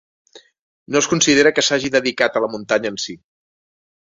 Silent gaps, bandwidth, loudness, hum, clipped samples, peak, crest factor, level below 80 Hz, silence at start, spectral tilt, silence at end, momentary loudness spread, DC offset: 0.61-0.86 s; 8 kHz; -17 LUFS; none; under 0.1%; 0 dBFS; 20 dB; -58 dBFS; 0.35 s; -2.5 dB/octave; 1 s; 11 LU; under 0.1%